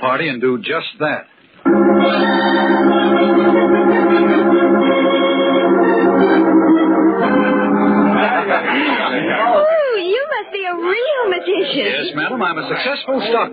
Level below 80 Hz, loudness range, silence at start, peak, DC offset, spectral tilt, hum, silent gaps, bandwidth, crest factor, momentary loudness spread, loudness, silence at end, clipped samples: -58 dBFS; 4 LU; 0 s; 0 dBFS; under 0.1%; -10.5 dB/octave; none; none; 5 kHz; 14 dB; 7 LU; -14 LUFS; 0 s; under 0.1%